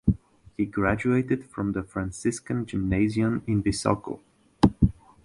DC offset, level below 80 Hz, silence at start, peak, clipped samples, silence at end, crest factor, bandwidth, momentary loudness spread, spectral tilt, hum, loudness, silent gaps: under 0.1%; -40 dBFS; 0.05 s; -2 dBFS; under 0.1%; 0.35 s; 24 dB; 11.5 kHz; 9 LU; -6.5 dB/octave; none; -26 LUFS; none